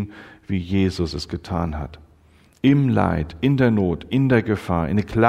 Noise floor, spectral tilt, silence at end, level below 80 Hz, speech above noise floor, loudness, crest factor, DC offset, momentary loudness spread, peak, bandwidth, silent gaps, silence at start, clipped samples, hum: -54 dBFS; -8 dB/octave; 0 s; -40 dBFS; 33 dB; -21 LUFS; 20 dB; under 0.1%; 11 LU; 0 dBFS; 11 kHz; none; 0 s; under 0.1%; none